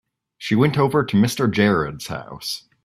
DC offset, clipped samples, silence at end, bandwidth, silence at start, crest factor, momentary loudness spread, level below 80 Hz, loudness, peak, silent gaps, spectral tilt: under 0.1%; under 0.1%; 0.25 s; 14.5 kHz; 0.4 s; 18 dB; 13 LU; -52 dBFS; -20 LUFS; -2 dBFS; none; -6 dB/octave